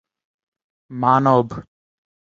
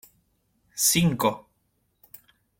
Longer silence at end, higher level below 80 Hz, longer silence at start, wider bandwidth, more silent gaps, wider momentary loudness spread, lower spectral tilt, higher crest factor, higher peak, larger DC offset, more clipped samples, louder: second, 0.7 s vs 1.2 s; about the same, -56 dBFS vs -56 dBFS; first, 0.9 s vs 0.75 s; second, 7.4 kHz vs 16.5 kHz; neither; about the same, 21 LU vs 20 LU; first, -8.5 dB/octave vs -3.5 dB/octave; about the same, 20 dB vs 20 dB; first, -2 dBFS vs -8 dBFS; neither; neither; first, -17 LUFS vs -22 LUFS